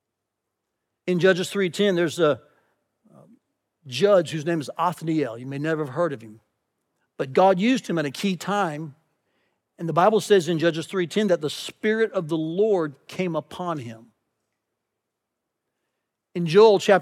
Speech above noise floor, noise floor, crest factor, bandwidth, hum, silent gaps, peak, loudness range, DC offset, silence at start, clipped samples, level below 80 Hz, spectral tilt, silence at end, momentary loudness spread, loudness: 60 dB; -82 dBFS; 20 dB; 15 kHz; none; none; -4 dBFS; 5 LU; under 0.1%; 1.05 s; under 0.1%; -82 dBFS; -5.5 dB/octave; 0 s; 12 LU; -23 LUFS